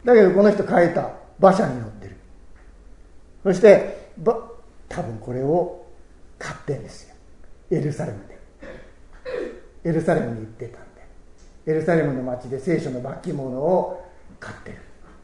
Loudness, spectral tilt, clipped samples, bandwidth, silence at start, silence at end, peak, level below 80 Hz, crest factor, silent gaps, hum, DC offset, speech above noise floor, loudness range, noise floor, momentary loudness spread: -21 LUFS; -7.5 dB/octave; under 0.1%; 11 kHz; 0.05 s; 0.3 s; 0 dBFS; -48 dBFS; 22 dB; none; none; under 0.1%; 25 dB; 11 LU; -45 dBFS; 24 LU